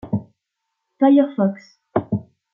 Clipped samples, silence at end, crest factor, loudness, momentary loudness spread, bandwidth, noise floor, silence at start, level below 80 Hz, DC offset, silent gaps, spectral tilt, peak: under 0.1%; 0.3 s; 18 dB; -20 LUFS; 13 LU; 6 kHz; -78 dBFS; 0.05 s; -60 dBFS; under 0.1%; none; -10 dB/octave; -4 dBFS